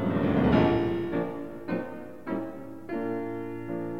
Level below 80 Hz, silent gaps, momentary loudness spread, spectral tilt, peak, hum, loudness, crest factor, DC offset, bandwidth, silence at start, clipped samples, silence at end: -48 dBFS; none; 15 LU; -9 dB/octave; -10 dBFS; none; -29 LUFS; 18 dB; 0.5%; 15.5 kHz; 0 s; under 0.1%; 0 s